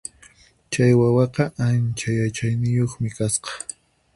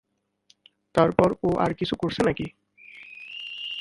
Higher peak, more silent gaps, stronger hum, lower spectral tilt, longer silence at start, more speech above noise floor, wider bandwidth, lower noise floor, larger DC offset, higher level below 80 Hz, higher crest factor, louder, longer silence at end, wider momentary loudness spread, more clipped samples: second, -4 dBFS vs 0 dBFS; neither; neither; about the same, -6 dB/octave vs -6.5 dB/octave; second, 0.7 s vs 0.95 s; second, 32 dB vs 41 dB; about the same, 11.5 kHz vs 11.5 kHz; second, -52 dBFS vs -64 dBFS; neither; about the same, -52 dBFS vs -52 dBFS; second, 16 dB vs 26 dB; first, -21 LUFS vs -25 LUFS; first, 0.55 s vs 0 s; second, 14 LU vs 18 LU; neither